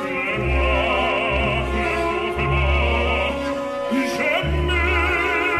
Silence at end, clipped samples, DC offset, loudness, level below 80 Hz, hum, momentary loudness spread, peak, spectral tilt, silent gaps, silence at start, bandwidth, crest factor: 0 s; under 0.1%; under 0.1%; -20 LUFS; -26 dBFS; none; 4 LU; -8 dBFS; -6 dB/octave; none; 0 s; 13.5 kHz; 12 dB